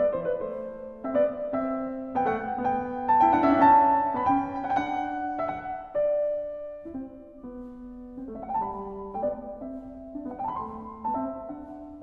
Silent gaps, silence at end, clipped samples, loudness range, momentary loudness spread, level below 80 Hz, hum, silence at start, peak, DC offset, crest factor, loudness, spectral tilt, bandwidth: none; 0 s; under 0.1%; 12 LU; 20 LU; -56 dBFS; none; 0 s; -8 dBFS; under 0.1%; 20 dB; -27 LUFS; -8 dB/octave; 6.6 kHz